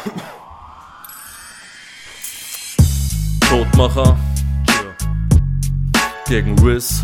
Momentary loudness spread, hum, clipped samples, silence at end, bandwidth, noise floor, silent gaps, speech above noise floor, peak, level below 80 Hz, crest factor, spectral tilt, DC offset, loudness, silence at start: 22 LU; none; under 0.1%; 0 s; 19 kHz; -38 dBFS; none; 26 dB; 0 dBFS; -22 dBFS; 16 dB; -5 dB/octave; under 0.1%; -16 LUFS; 0 s